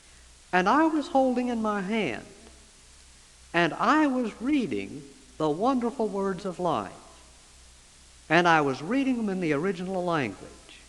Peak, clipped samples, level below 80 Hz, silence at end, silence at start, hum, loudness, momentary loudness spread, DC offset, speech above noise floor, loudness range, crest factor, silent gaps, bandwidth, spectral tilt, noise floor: -4 dBFS; under 0.1%; -58 dBFS; 0.1 s; 0.55 s; none; -26 LUFS; 10 LU; under 0.1%; 27 dB; 3 LU; 24 dB; none; 12 kHz; -5.5 dB/octave; -53 dBFS